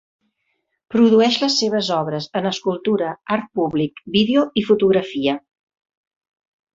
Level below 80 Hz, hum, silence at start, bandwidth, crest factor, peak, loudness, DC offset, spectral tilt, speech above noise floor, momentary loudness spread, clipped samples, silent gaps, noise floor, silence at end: -60 dBFS; none; 0.9 s; 7.8 kHz; 16 dB; -4 dBFS; -19 LUFS; under 0.1%; -5 dB/octave; 54 dB; 8 LU; under 0.1%; none; -72 dBFS; 1.4 s